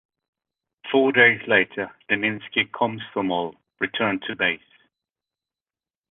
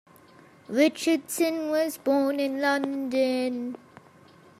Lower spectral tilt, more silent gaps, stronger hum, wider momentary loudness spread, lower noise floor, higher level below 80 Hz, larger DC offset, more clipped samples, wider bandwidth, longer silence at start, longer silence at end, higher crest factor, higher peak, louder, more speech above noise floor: first, -8 dB/octave vs -3 dB/octave; neither; neither; first, 14 LU vs 8 LU; first, under -90 dBFS vs -54 dBFS; first, -66 dBFS vs -80 dBFS; neither; neither; second, 4 kHz vs 15.5 kHz; first, 0.85 s vs 0.7 s; first, 1.55 s vs 0.85 s; about the same, 22 dB vs 18 dB; first, -2 dBFS vs -10 dBFS; first, -22 LUFS vs -26 LUFS; first, over 68 dB vs 29 dB